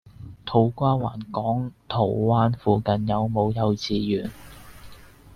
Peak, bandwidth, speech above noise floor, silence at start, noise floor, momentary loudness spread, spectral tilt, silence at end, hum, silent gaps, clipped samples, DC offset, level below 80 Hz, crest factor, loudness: -6 dBFS; 14 kHz; 22 dB; 0.2 s; -45 dBFS; 8 LU; -8 dB/octave; 0.35 s; none; none; under 0.1%; under 0.1%; -50 dBFS; 18 dB; -24 LUFS